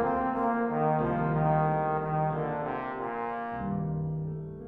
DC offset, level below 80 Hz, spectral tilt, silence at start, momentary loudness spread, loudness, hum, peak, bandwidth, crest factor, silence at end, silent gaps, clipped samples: under 0.1%; -52 dBFS; -11 dB/octave; 0 s; 7 LU; -30 LUFS; none; -14 dBFS; 3.9 kHz; 16 dB; 0 s; none; under 0.1%